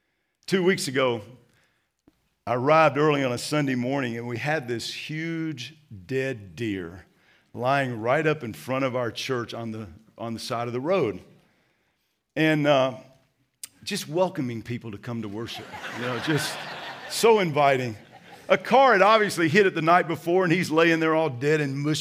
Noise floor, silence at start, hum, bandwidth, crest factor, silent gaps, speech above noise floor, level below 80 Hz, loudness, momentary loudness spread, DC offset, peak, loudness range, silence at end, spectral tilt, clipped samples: -73 dBFS; 0.5 s; none; 16 kHz; 22 dB; none; 49 dB; -70 dBFS; -24 LUFS; 16 LU; under 0.1%; -4 dBFS; 10 LU; 0 s; -5 dB/octave; under 0.1%